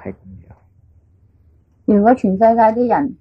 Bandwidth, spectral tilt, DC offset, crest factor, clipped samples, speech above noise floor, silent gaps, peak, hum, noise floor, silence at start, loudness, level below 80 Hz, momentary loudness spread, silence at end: 7.2 kHz; -10 dB/octave; under 0.1%; 14 dB; under 0.1%; 40 dB; none; -2 dBFS; none; -53 dBFS; 0.05 s; -14 LUFS; -50 dBFS; 10 LU; 0.05 s